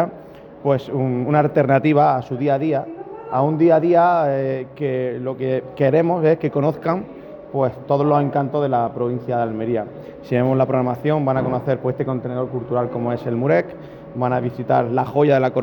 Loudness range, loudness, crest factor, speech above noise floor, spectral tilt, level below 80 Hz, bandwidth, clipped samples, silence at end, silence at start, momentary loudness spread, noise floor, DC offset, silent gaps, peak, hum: 4 LU; -19 LUFS; 14 dB; 21 dB; -10 dB/octave; -56 dBFS; 18.5 kHz; under 0.1%; 0 s; 0 s; 10 LU; -39 dBFS; under 0.1%; none; -4 dBFS; none